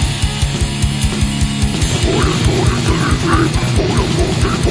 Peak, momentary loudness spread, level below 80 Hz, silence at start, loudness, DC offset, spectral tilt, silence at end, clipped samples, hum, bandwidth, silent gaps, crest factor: 0 dBFS; 3 LU; -20 dBFS; 0 s; -15 LUFS; under 0.1%; -5 dB/octave; 0 s; under 0.1%; none; 11 kHz; none; 14 dB